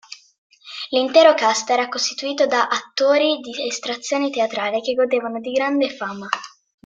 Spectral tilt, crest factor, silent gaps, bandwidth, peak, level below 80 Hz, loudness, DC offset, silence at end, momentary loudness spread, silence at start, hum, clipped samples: -2 dB/octave; 18 dB; 0.38-0.50 s; 9.2 kHz; -2 dBFS; -70 dBFS; -19 LUFS; under 0.1%; 0.35 s; 13 LU; 0.1 s; none; under 0.1%